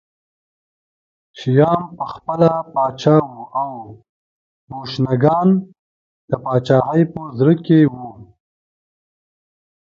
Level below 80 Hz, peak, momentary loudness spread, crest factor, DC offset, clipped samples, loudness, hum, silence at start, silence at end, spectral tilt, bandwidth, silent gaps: -56 dBFS; 0 dBFS; 14 LU; 18 dB; under 0.1%; under 0.1%; -17 LUFS; none; 1.35 s; 1.7 s; -9 dB/octave; 7.2 kHz; 4.09-4.68 s, 5.79-6.28 s